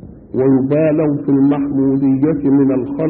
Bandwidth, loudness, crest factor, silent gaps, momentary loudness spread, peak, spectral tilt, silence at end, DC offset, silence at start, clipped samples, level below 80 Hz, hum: 3.2 kHz; -14 LUFS; 10 dB; none; 3 LU; -4 dBFS; -15 dB/octave; 0 s; under 0.1%; 0 s; under 0.1%; -46 dBFS; none